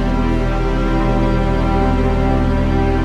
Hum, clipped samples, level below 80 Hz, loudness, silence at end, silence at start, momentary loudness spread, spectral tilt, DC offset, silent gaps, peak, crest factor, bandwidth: none; under 0.1%; -18 dBFS; -17 LUFS; 0 s; 0 s; 2 LU; -8 dB/octave; under 0.1%; none; -2 dBFS; 12 dB; 7.6 kHz